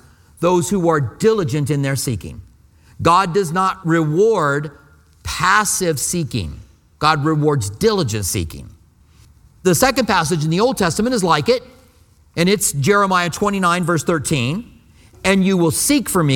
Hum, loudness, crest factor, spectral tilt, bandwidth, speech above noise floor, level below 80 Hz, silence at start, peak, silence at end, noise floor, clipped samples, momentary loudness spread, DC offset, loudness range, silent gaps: none; -17 LUFS; 18 dB; -4.5 dB/octave; 17.5 kHz; 34 dB; -42 dBFS; 0.4 s; 0 dBFS; 0 s; -51 dBFS; under 0.1%; 9 LU; under 0.1%; 2 LU; none